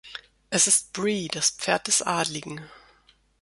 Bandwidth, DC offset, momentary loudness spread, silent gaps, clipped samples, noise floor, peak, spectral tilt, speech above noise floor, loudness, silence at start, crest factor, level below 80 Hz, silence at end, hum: 12 kHz; under 0.1%; 21 LU; none; under 0.1%; -61 dBFS; -6 dBFS; -1.5 dB/octave; 36 dB; -23 LUFS; 0.05 s; 20 dB; -64 dBFS; 0.65 s; none